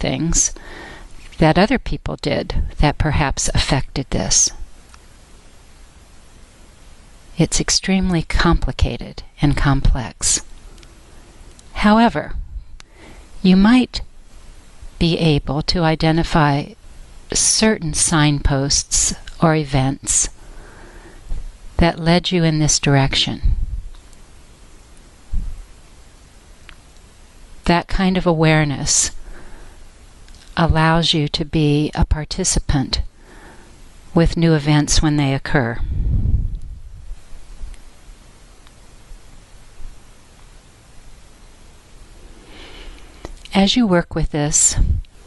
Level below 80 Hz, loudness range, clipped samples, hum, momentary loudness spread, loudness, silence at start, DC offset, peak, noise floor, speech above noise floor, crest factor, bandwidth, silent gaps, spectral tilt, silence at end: -26 dBFS; 8 LU; under 0.1%; none; 18 LU; -17 LUFS; 0 s; under 0.1%; -2 dBFS; -44 dBFS; 28 dB; 18 dB; 11.5 kHz; none; -4 dB/octave; 0.2 s